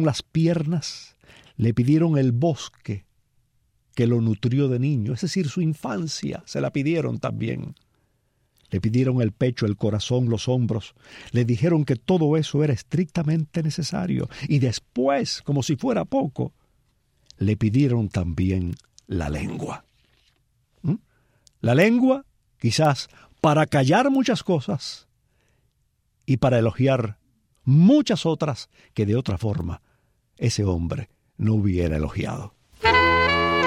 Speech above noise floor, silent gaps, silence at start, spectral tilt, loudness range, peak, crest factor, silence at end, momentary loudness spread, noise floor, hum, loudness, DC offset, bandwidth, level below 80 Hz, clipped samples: 47 dB; none; 0 s; -6.5 dB/octave; 5 LU; -4 dBFS; 18 dB; 0 s; 14 LU; -69 dBFS; none; -23 LUFS; under 0.1%; 13.5 kHz; -46 dBFS; under 0.1%